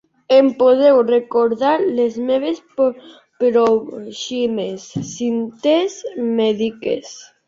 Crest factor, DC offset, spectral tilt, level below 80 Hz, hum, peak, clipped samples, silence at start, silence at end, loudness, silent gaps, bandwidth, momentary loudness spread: 16 dB; under 0.1%; -5 dB/octave; -62 dBFS; none; -2 dBFS; under 0.1%; 0.3 s; 0.25 s; -17 LUFS; none; 7.6 kHz; 13 LU